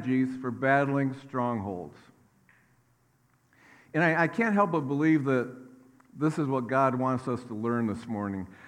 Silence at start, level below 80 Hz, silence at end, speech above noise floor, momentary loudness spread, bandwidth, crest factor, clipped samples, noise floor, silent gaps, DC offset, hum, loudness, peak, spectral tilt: 0 s; -74 dBFS; 0 s; 40 dB; 10 LU; 10.5 kHz; 20 dB; under 0.1%; -67 dBFS; none; under 0.1%; none; -28 LUFS; -10 dBFS; -8 dB/octave